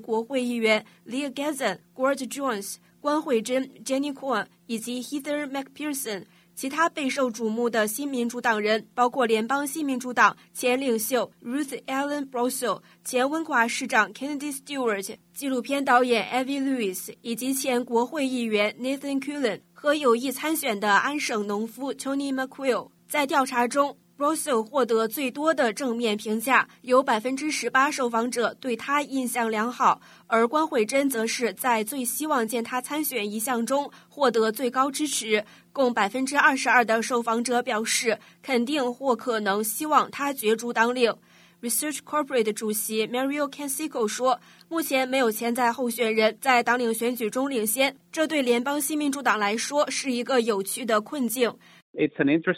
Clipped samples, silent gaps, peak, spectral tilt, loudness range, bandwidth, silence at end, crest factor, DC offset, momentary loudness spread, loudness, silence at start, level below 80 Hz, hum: under 0.1%; 51.82-51.94 s; -4 dBFS; -3 dB/octave; 4 LU; 16 kHz; 0 s; 20 dB; under 0.1%; 8 LU; -25 LUFS; 0 s; -78 dBFS; none